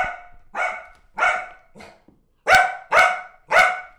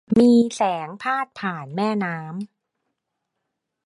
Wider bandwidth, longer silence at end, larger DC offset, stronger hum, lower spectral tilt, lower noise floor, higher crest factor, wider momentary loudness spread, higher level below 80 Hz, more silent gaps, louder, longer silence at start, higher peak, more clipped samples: first, over 20 kHz vs 11 kHz; second, 0.1 s vs 1.4 s; neither; neither; second, -1 dB/octave vs -6 dB/octave; second, -57 dBFS vs -79 dBFS; about the same, 16 dB vs 18 dB; first, 20 LU vs 17 LU; first, -50 dBFS vs -60 dBFS; neither; about the same, -19 LUFS vs -21 LUFS; about the same, 0 s vs 0.1 s; about the same, -6 dBFS vs -4 dBFS; neither